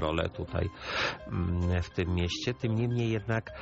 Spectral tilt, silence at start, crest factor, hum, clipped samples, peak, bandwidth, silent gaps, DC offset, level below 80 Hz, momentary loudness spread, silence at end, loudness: -5 dB/octave; 0 s; 18 dB; none; under 0.1%; -14 dBFS; 8 kHz; none; under 0.1%; -46 dBFS; 4 LU; 0 s; -31 LUFS